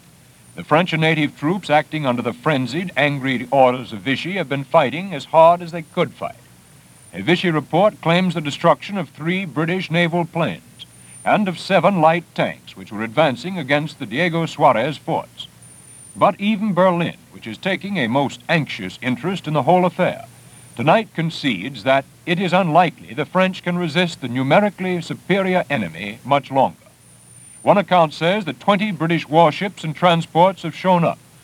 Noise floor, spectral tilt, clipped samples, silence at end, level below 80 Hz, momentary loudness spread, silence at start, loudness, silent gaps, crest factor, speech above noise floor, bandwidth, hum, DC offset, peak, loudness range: -48 dBFS; -6 dB/octave; under 0.1%; 0.3 s; -62 dBFS; 10 LU; 0.55 s; -19 LUFS; none; 18 dB; 29 dB; 15 kHz; none; under 0.1%; 0 dBFS; 3 LU